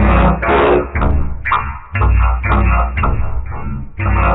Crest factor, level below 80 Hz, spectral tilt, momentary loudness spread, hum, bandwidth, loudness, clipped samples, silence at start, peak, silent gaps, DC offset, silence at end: 12 dB; -16 dBFS; -10.5 dB/octave; 11 LU; none; 4 kHz; -15 LUFS; under 0.1%; 0 s; -2 dBFS; none; under 0.1%; 0 s